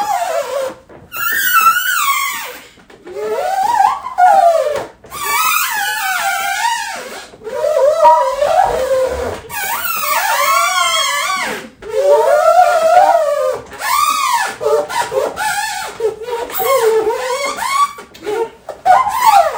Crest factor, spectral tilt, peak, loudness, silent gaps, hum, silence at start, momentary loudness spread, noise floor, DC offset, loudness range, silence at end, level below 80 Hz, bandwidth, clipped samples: 14 dB; -0.5 dB/octave; 0 dBFS; -14 LUFS; none; none; 0 s; 13 LU; -39 dBFS; under 0.1%; 4 LU; 0 s; -48 dBFS; 16.5 kHz; under 0.1%